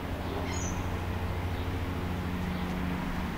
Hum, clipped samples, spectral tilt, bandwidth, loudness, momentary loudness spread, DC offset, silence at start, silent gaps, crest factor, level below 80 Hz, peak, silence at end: none; under 0.1%; -5.5 dB/octave; 16 kHz; -34 LUFS; 1 LU; under 0.1%; 0 s; none; 12 dB; -40 dBFS; -20 dBFS; 0 s